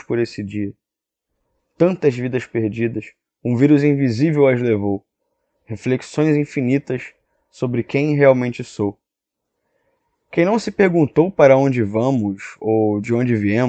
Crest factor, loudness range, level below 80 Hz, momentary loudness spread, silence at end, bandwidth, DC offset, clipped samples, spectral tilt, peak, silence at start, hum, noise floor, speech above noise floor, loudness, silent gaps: 18 dB; 5 LU; -58 dBFS; 13 LU; 0 s; 8.6 kHz; under 0.1%; under 0.1%; -8 dB/octave; 0 dBFS; 0.1 s; none; -84 dBFS; 67 dB; -18 LUFS; none